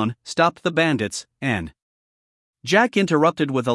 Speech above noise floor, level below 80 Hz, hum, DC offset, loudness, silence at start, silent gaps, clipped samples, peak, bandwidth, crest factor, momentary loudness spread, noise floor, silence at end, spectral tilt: over 70 dB; -58 dBFS; none; under 0.1%; -20 LUFS; 0 s; 1.82-2.53 s; under 0.1%; -2 dBFS; 12 kHz; 20 dB; 10 LU; under -90 dBFS; 0 s; -5 dB/octave